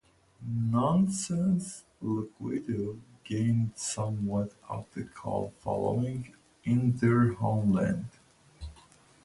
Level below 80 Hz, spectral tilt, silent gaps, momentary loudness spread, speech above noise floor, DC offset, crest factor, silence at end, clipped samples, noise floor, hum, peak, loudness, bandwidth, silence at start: -56 dBFS; -7 dB/octave; none; 16 LU; 29 dB; under 0.1%; 16 dB; 0.5 s; under 0.1%; -59 dBFS; none; -14 dBFS; -30 LUFS; 11.5 kHz; 0.4 s